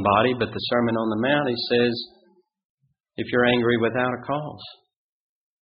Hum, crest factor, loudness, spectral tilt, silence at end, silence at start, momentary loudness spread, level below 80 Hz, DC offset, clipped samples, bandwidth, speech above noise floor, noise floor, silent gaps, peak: none; 18 dB; -22 LUFS; -3.5 dB/octave; 0.9 s; 0 s; 17 LU; -58 dBFS; under 0.1%; under 0.1%; 5.2 kHz; 39 dB; -61 dBFS; 2.64-2.78 s; -6 dBFS